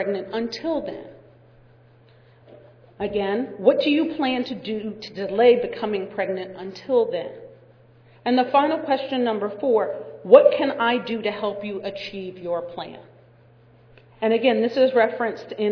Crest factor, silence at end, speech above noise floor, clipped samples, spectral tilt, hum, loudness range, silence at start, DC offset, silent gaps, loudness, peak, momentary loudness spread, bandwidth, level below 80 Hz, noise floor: 22 dB; 0 s; 31 dB; under 0.1%; -6.5 dB/octave; none; 9 LU; 0 s; under 0.1%; none; -22 LUFS; 0 dBFS; 15 LU; 5.4 kHz; -62 dBFS; -53 dBFS